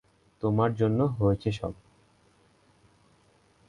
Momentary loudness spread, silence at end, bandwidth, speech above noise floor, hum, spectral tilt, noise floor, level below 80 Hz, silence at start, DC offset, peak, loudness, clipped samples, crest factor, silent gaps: 11 LU; 1.95 s; 9.8 kHz; 37 dB; none; -9 dB/octave; -63 dBFS; -52 dBFS; 0.4 s; under 0.1%; -10 dBFS; -28 LUFS; under 0.1%; 20 dB; none